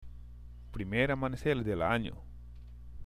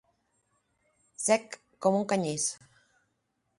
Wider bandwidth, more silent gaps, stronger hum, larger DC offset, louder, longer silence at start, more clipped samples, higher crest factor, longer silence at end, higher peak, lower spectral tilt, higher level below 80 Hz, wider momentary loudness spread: first, 15 kHz vs 11.5 kHz; neither; first, 60 Hz at -50 dBFS vs none; first, 0.1% vs under 0.1%; second, -33 LUFS vs -29 LUFS; second, 0 s vs 1.2 s; neither; about the same, 20 dB vs 22 dB; second, 0 s vs 1.05 s; second, -16 dBFS vs -10 dBFS; first, -7 dB/octave vs -4 dB/octave; first, -48 dBFS vs -76 dBFS; first, 21 LU vs 11 LU